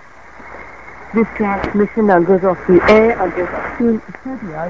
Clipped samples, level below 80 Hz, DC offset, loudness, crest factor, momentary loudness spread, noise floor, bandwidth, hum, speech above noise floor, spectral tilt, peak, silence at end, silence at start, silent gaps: under 0.1%; -40 dBFS; 0.8%; -14 LUFS; 16 dB; 23 LU; -38 dBFS; 7.6 kHz; none; 24 dB; -8 dB/octave; 0 dBFS; 0 s; 0.35 s; none